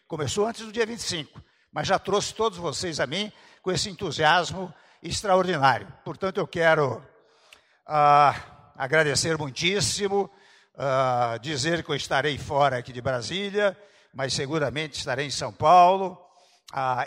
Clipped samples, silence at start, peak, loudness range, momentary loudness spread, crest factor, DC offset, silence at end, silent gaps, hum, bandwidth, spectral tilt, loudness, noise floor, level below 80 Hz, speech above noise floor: under 0.1%; 0.1 s; -6 dBFS; 4 LU; 13 LU; 20 dB; under 0.1%; 0 s; none; none; 15.5 kHz; -3.5 dB/octave; -24 LUFS; -57 dBFS; -56 dBFS; 33 dB